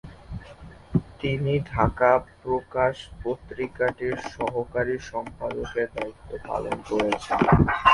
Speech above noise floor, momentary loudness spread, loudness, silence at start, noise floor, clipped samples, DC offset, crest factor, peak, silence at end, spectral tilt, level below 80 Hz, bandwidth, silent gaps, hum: 20 dB; 14 LU; -26 LUFS; 0.05 s; -45 dBFS; under 0.1%; under 0.1%; 22 dB; -4 dBFS; 0 s; -7 dB/octave; -40 dBFS; 11.5 kHz; none; none